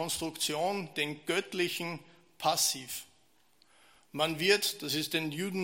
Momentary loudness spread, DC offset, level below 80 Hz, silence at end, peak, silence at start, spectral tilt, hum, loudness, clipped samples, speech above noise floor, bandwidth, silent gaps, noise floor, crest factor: 12 LU; under 0.1%; -70 dBFS; 0 s; -10 dBFS; 0 s; -2.5 dB/octave; none; -31 LUFS; under 0.1%; 37 dB; 16.5 kHz; none; -69 dBFS; 24 dB